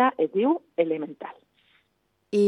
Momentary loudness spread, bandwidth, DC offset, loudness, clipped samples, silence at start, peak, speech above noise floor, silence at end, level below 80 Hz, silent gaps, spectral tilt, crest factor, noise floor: 17 LU; 11 kHz; under 0.1%; -26 LUFS; under 0.1%; 0 s; -8 dBFS; 47 dB; 0 s; -80 dBFS; none; -7 dB/octave; 18 dB; -72 dBFS